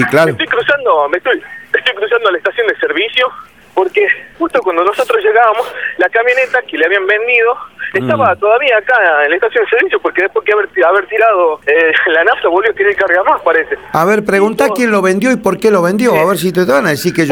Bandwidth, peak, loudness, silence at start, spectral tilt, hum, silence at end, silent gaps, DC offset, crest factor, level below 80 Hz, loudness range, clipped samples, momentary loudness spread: 20 kHz; 0 dBFS; -11 LUFS; 0 s; -4.5 dB/octave; none; 0 s; none; 0.2%; 12 dB; -52 dBFS; 3 LU; under 0.1%; 5 LU